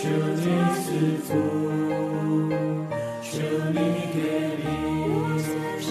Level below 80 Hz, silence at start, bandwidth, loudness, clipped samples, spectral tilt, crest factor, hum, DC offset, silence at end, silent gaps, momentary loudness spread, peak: -56 dBFS; 0 s; 14 kHz; -26 LUFS; under 0.1%; -6.5 dB/octave; 14 dB; none; under 0.1%; 0 s; none; 5 LU; -12 dBFS